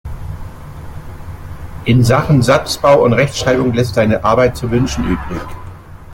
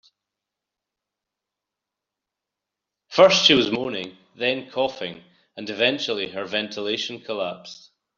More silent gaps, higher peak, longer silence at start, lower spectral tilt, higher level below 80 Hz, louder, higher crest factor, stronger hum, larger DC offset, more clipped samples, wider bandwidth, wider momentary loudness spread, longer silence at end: neither; about the same, 0 dBFS vs -2 dBFS; second, 0.05 s vs 3.1 s; first, -6 dB/octave vs -3 dB/octave; first, -32 dBFS vs -66 dBFS; first, -13 LUFS vs -21 LUFS; second, 14 dB vs 24 dB; neither; neither; neither; first, 17 kHz vs 7.4 kHz; first, 21 LU vs 18 LU; second, 0 s vs 0.45 s